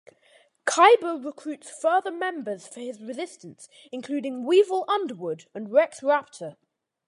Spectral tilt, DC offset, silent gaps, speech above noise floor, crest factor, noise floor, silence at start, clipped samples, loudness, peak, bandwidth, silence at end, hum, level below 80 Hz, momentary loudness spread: -3 dB/octave; under 0.1%; none; 36 dB; 22 dB; -60 dBFS; 0.65 s; under 0.1%; -24 LUFS; -4 dBFS; 11.5 kHz; 0.55 s; none; -84 dBFS; 20 LU